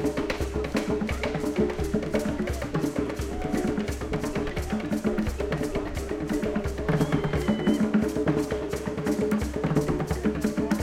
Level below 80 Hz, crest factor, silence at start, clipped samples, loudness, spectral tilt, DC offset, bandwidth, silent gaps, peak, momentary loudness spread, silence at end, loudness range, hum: -38 dBFS; 16 dB; 0 s; under 0.1%; -28 LUFS; -6.5 dB/octave; under 0.1%; 16 kHz; none; -10 dBFS; 5 LU; 0 s; 3 LU; none